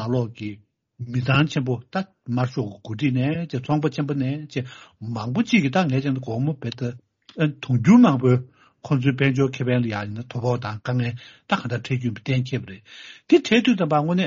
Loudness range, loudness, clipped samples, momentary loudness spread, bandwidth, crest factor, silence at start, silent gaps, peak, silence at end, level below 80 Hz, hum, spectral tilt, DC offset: 5 LU; -22 LUFS; under 0.1%; 13 LU; 7.4 kHz; 20 dB; 0 s; none; -2 dBFS; 0 s; -58 dBFS; none; -6 dB/octave; under 0.1%